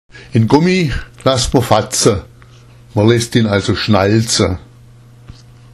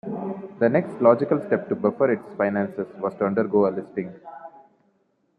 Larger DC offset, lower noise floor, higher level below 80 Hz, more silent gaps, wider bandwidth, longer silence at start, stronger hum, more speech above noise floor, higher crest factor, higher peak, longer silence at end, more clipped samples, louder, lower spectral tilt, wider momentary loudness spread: neither; second, -41 dBFS vs -67 dBFS; first, -34 dBFS vs -70 dBFS; neither; first, 13.5 kHz vs 4.7 kHz; about the same, 0.15 s vs 0.05 s; neither; second, 28 dB vs 45 dB; second, 14 dB vs 22 dB; about the same, 0 dBFS vs -2 dBFS; second, 0.45 s vs 0.9 s; first, 0.1% vs under 0.1%; first, -14 LUFS vs -23 LUFS; second, -5 dB/octave vs -10 dB/octave; second, 7 LU vs 14 LU